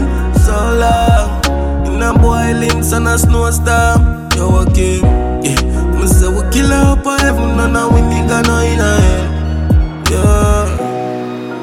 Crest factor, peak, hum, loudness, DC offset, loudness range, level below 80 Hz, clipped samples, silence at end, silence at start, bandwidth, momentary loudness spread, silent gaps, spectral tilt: 10 dB; 0 dBFS; none; -12 LUFS; under 0.1%; 1 LU; -14 dBFS; under 0.1%; 0 s; 0 s; 16 kHz; 5 LU; none; -5.5 dB/octave